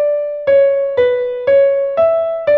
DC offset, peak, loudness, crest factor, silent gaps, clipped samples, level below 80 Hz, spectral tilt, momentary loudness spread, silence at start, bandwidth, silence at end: under 0.1%; -4 dBFS; -14 LUFS; 10 dB; none; under 0.1%; -54 dBFS; -6.5 dB/octave; 5 LU; 0 s; 4.5 kHz; 0 s